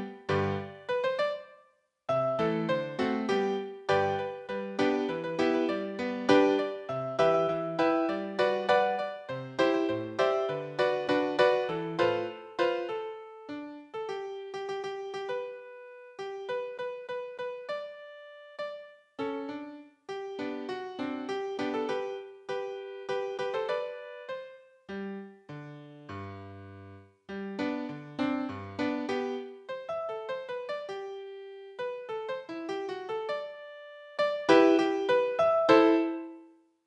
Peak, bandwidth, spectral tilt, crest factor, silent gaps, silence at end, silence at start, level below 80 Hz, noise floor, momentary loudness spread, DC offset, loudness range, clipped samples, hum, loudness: -6 dBFS; 9.4 kHz; -6 dB/octave; 26 dB; none; 0.4 s; 0 s; -74 dBFS; -65 dBFS; 18 LU; under 0.1%; 11 LU; under 0.1%; none; -31 LUFS